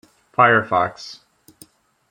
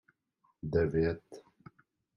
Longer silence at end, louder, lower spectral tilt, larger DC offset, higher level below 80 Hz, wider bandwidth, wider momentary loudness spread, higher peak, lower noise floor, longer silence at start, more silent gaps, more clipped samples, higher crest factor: first, 0.95 s vs 0.75 s; first, -17 LUFS vs -32 LUFS; second, -5.5 dB/octave vs -9 dB/octave; neither; second, -64 dBFS vs -54 dBFS; first, 16.5 kHz vs 6.8 kHz; first, 22 LU vs 16 LU; first, -2 dBFS vs -16 dBFS; second, -51 dBFS vs -75 dBFS; second, 0.4 s vs 0.65 s; neither; neither; about the same, 20 dB vs 20 dB